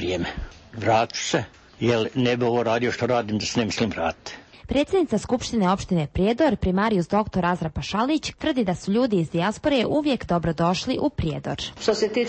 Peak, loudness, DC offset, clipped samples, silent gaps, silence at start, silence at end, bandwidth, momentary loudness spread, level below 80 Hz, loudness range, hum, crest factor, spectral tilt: -8 dBFS; -23 LUFS; under 0.1%; under 0.1%; none; 0 s; 0 s; 8.8 kHz; 7 LU; -42 dBFS; 1 LU; none; 16 dB; -5.5 dB/octave